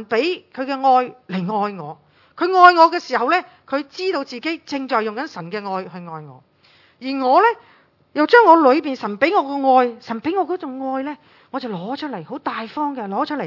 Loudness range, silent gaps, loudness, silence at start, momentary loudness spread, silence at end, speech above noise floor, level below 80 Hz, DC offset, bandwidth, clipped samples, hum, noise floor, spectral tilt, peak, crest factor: 9 LU; none; -18 LUFS; 0 s; 17 LU; 0 s; 36 dB; -70 dBFS; under 0.1%; 6 kHz; under 0.1%; none; -54 dBFS; -6 dB/octave; 0 dBFS; 18 dB